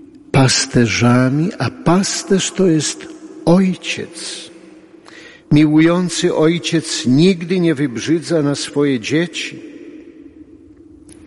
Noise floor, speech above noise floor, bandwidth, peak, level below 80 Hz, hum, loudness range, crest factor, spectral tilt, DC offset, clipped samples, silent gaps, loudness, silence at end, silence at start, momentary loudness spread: -42 dBFS; 27 dB; 11.5 kHz; -2 dBFS; -46 dBFS; none; 4 LU; 14 dB; -5 dB/octave; under 0.1%; under 0.1%; none; -15 LUFS; 0.15 s; 0.35 s; 14 LU